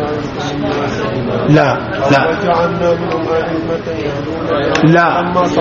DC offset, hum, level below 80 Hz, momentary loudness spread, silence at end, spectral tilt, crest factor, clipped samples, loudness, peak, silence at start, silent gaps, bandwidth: under 0.1%; none; -38 dBFS; 9 LU; 0 s; -5 dB/octave; 14 dB; under 0.1%; -14 LUFS; 0 dBFS; 0 s; none; 7.4 kHz